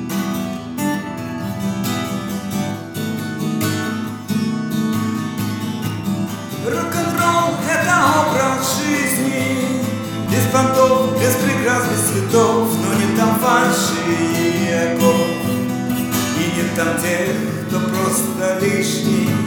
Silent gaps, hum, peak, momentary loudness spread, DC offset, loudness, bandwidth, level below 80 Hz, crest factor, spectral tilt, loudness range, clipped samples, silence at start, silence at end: none; none; 0 dBFS; 9 LU; under 0.1%; -18 LUFS; over 20 kHz; -56 dBFS; 18 dB; -4.5 dB/octave; 6 LU; under 0.1%; 0 s; 0 s